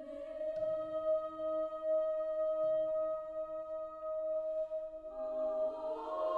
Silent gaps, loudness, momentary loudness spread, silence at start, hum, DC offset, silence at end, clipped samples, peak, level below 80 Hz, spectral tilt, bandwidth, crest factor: none; -37 LUFS; 8 LU; 0 s; none; under 0.1%; 0 s; under 0.1%; -24 dBFS; -68 dBFS; -6.5 dB/octave; 4.7 kHz; 14 dB